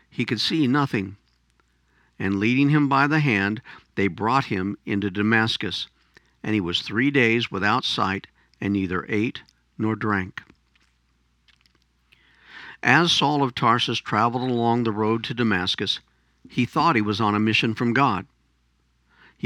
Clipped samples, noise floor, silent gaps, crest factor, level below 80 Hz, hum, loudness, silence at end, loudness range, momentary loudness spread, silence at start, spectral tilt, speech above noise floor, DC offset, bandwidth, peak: under 0.1%; -66 dBFS; none; 22 dB; -60 dBFS; none; -22 LUFS; 1.2 s; 7 LU; 11 LU; 0.2 s; -5.5 dB/octave; 44 dB; under 0.1%; 12 kHz; -2 dBFS